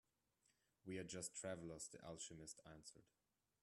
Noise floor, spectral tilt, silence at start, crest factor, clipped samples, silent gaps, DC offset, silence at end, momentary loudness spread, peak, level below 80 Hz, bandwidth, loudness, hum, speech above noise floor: -85 dBFS; -3.5 dB/octave; 0.5 s; 20 dB; under 0.1%; none; under 0.1%; 0.6 s; 12 LU; -36 dBFS; -80 dBFS; 13 kHz; -54 LUFS; none; 30 dB